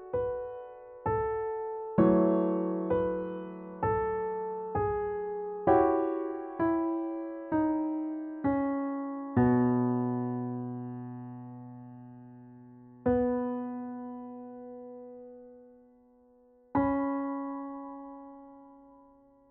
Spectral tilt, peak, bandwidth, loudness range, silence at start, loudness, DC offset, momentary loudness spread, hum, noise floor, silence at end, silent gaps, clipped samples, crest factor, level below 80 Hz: -9.5 dB/octave; -12 dBFS; 3.6 kHz; 7 LU; 0 s; -31 LUFS; under 0.1%; 21 LU; none; -61 dBFS; 0.55 s; none; under 0.1%; 20 dB; -56 dBFS